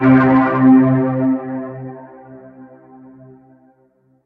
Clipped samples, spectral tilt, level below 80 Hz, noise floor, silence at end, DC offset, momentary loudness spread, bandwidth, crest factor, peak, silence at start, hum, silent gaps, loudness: under 0.1%; -11 dB/octave; -54 dBFS; -57 dBFS; 1.6 s; under 0.1%; 21 LU; 3.8 kHz; 16 dB; 0 dBFS; 0 s; none; none; -14 LUFS